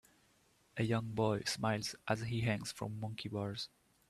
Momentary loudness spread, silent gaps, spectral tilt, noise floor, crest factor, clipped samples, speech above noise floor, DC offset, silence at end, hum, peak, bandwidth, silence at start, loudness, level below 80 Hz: 8 LU; none; -5 dB/octave; -71 dBFS; 20 dB; under 0.1%; 34 dB; under 0.1%; 0.45 s; none; -18 dBFS; 13.5 kHz; 0.75 s; -38 LUFS; -66 dBFS